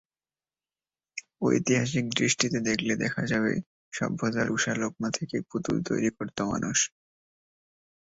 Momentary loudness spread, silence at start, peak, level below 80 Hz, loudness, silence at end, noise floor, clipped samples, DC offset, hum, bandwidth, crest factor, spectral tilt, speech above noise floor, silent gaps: 8 LU; 1.15 s; -8 dBFS; -62 dBFS; -28 LUFS; 1.15 s; under -90 dBFS; under 0.1%; under 0.1%; none; 8 kHz; 22 dB; -4 dB/octave; over 62 dB; 3.66-3.91 s